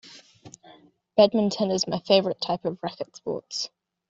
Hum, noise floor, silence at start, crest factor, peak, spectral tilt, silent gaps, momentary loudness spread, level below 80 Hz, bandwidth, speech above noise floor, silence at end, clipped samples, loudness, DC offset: none; -54 dBFS; 0.05 s; 22 dB; -4 dBFS; -4.5 dB/octave; none; 13 LU; -66 dBFS; 7.8 kHz; 30 dB; 0.45 s; under 0.1%; -25 LUFS; under 0.1%